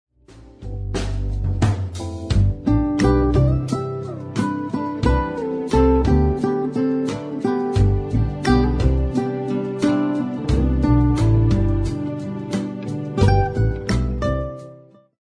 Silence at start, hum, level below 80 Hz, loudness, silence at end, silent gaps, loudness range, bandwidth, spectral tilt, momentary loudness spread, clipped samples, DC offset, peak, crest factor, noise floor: 0.3 s; none; -26 dBFS; -20 LUFS; 0.4 s; none; 2 LU; 10.5 kHz; -8 dB/octave; 10 LU; under 0.1%; under 0.1%; -2 dBFS; 18 dB; -45 dBFS